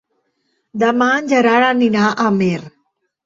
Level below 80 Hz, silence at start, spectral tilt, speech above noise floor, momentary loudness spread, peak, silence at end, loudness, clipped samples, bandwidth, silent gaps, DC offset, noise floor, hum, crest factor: -58 dBFS; 0.75 s; -5.5 dB/octave; 53 dB; 7 LU; -2 dBFS; 0.55 s; -15 LUFS; under 0.1%; 7.6 kHz; none; under 0.1%; -67 dBFS; none; 14 dB